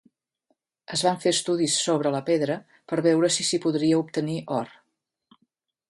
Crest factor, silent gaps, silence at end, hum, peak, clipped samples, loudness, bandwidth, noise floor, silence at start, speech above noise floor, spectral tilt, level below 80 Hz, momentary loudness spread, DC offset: 18 dB; none; 1.2 s; none; -8 dBFS; under 0.1%; -24 LUFS; 11.5 kHz; -77 dBFS; 0.9 s; 53 dB; -4 dB/octave; -72 dBFS; 9 LU; under 0.1%